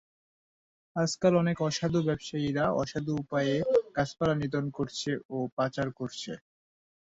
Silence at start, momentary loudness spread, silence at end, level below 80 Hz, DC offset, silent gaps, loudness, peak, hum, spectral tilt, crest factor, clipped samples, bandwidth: 0.95 s; 9 LU; 0.8 s; -60 dBFS; under 0.1%; 5.25-5.29 s, 5.52-5.57 s; -30 LUFS; -12 dBFS; none; -6 dB/octave; 18 dB; under 0.1%; 8 kHz